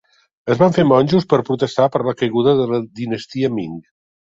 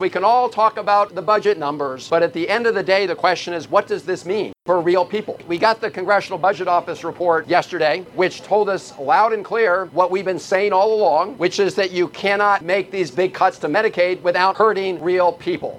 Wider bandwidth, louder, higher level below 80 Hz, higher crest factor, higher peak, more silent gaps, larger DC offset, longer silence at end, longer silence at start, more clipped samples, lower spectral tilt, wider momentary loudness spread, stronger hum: second, 7.8 kHz vs 12.5 kHz; about the same, -17 LUFS vs -18 LUFS; first, -54 dBFS vs -64 dBFS; about the same, 16 dB vs 18 dB; about the same, 0 dBFS vs 0 dBFS; neither; neither; first, 0.5 s vs 0 s; first, 0.45 s vs 0 s; neither; first, -7.5 dB/octave vs -4.5 dB/octave; first, 12 LU vs 6 LU; neither